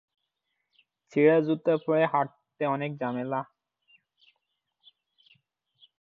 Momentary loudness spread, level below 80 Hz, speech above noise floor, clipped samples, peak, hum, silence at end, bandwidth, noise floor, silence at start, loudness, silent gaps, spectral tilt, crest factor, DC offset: 12 LU; -80 dBFS; 56 dB; under 0.1%; -10 dBFS; none; 2.55 s; 6.8 kHz; -81 dBFS; 1.15 s; -27 LUFS; none; -8.5 dB/octave; 20 dB; under 0.1%